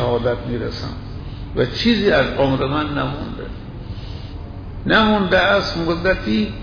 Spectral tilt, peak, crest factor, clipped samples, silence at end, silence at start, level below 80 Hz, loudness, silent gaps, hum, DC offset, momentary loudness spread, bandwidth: -6.5 dB/octave; -4 dBFS; 16 dB; under 0.1%; 0 s; 0 s; -34 dBFS; -18 LUFS; none; none; under 0.1%; 17 LU; 5.4 kHz